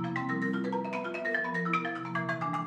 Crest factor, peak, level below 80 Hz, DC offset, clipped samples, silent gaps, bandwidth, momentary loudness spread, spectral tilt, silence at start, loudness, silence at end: 18 dB; -14 dBFS; -76 dBFS; under 0.1%; under 0.1%; none; 9.6 kHz; 4 LU; -7 dB/octave; 0 s; -32 LUFS; 0 s